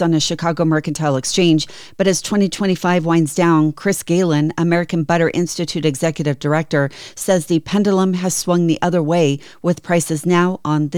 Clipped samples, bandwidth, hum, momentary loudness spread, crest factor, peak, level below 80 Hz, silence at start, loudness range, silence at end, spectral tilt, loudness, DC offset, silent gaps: under 0.1%; 18.5 kHz; none; 4 LU; 12 dB; -4 dBFS; -52 dBFS; 0 s; 2 LU; 0 s; -5.5 dB/octave; -17 LUFS; under 0.1%; none